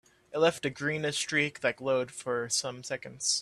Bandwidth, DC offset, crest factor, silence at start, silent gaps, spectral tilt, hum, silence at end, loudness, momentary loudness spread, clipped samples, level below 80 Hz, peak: 13 kHz; under 0.1%; 20 dB; 0.3 s; none; -2.5 dB/octave; none; 0 s; -30 LUFS; 9 LU; under 0.1%; -70 dBFS; -12 dBFS